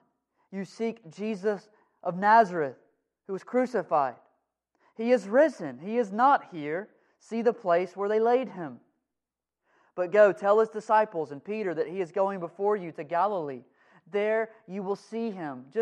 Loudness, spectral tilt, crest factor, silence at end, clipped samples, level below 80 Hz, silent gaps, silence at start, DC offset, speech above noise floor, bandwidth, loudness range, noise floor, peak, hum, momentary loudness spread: -27 LUFS; -6.5 dB/octave; 20 dB; 0 s; under 0.1%; -86 dBFS; none; 0.5 s; under 0.1%; 61 dB; 9.8 kHz; 4 LU; -88 dBFS; -8 dBFS; none; 16 LU